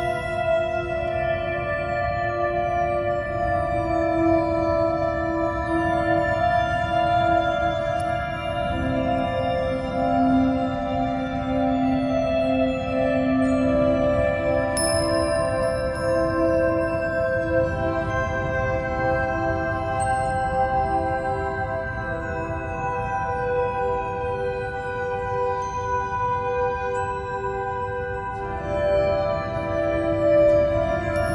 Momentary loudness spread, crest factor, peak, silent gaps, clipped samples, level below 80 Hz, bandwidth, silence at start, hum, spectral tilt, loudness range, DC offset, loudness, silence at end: 7 LU; 14 dB; -8 dBFS; none; under 0.1%; -38 dBFS; 11.5 kHz; 0 s; none; -6 dB/octave; 4 LU; under 0.1%; -23 LUFS; 0 s